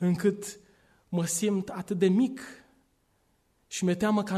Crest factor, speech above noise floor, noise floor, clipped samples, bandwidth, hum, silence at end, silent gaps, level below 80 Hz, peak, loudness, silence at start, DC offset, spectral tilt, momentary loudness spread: 16 dB; 43 dB; -70 dBFS; under 0.1%; 13.5 kHz; none; 0 s; none; -66 dBFS; -14 dBFS; -28 LUFS; 0 s; under 0.1%; -5.5 dB/octave; 14 LU